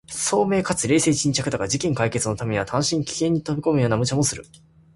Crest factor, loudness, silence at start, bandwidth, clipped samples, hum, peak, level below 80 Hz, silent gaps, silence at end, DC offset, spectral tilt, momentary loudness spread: 16 dB; -22 LUFS; 0.1 s; 11.5 kHz; under 0.1%; none; -6 dBFS; -50 dBFS; none; 0.5 s; under 0.1%; -4.5 dB/octave; 5 LU